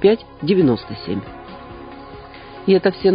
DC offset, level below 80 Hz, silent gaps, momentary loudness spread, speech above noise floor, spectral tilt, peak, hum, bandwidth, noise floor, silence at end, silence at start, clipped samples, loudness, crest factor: under 0.1%; -46 dBFS; none; 21 LU; 20 dB; -12 dB/octave; -2 dBFS; none; 5.2 kHz; -37 dBFS; 0 s; 0 s; under 0.1%; -19 LUFS; 18 dB